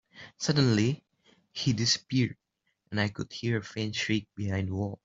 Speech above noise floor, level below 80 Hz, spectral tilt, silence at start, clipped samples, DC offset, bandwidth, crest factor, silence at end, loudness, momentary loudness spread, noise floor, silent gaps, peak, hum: 48 dB; -62 dBFS; -5 dB/octave; 0.15 s; under 0.1%; under 0.1%; 7.8 kHz; 18 dB; 0.1 s; -29 LUFS; 9 LU; -77 dBFS; none; -12 dBFS; none